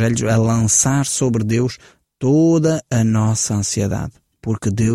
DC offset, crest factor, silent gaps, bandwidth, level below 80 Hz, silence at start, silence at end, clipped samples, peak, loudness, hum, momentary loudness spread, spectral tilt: under 0.1%; 14 dB; none; 14.5 kHz; -44 dBFS; 0 s; 0 s; under 0.1%; -2 dBFS; -17 LUFS; none; 11 LU; -5.5 dB/octave